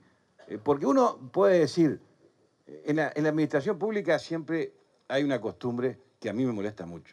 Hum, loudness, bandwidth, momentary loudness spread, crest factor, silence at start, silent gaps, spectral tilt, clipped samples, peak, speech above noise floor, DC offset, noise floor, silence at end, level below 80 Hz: none; -28 LUFS; 11 kHz; 13 LU; 16 dB; 0.5 s; none; -6.5 dB/octave; under 0.1%; -12 dBFS; 37 dB; under 0.1%; -64 dBFS; 0.1 s; -72 dBFS